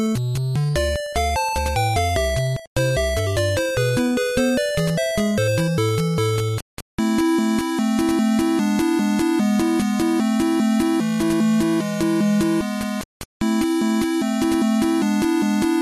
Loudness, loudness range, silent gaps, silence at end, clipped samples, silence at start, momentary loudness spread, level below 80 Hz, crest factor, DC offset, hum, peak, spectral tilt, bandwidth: -20 LUFS; 2 LU; 2.67-2.76 s, 6.62-6.98 s, 13.05-13.40 s; 0 s; under 0.1%; 0 s; 4 LU; -36 dBFS; 14 dB; under 0.1%; none; -6 dBFS; -5.5 dB/octave; 13.5 kHz